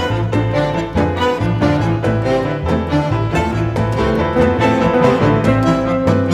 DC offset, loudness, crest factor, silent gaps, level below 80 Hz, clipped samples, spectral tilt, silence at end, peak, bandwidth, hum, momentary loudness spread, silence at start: under 0.1%; -15 LUFS; 14 dB; none; -30 dBFS; under 0.1%; -7.5 dB/octave; 0 s; 0 dBFS; 11.5 kHz; none; 5 LU; 0 s